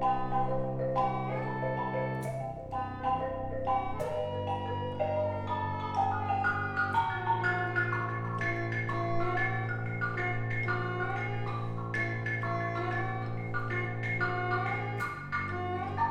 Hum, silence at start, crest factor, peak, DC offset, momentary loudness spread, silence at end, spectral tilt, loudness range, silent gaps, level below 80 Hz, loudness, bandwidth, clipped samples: none; 0 s; 16 dB; -16 dBFS; under 0.1%; 5 LU; 0 s; -7.5 dB/octave; 3 LU; none; -52 dBFS; -33 LUFS; 10.5 kHz; under 0.1%